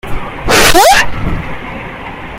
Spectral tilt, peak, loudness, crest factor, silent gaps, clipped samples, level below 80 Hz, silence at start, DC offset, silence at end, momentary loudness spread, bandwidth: -2.5 dB/octave; 0 dBFS; -8 LUFS; 10 dB; none; 0.3%; -22 dBFS; 0.05 s; under 0.1%; 0 s; 19 LU; 19.5 kHz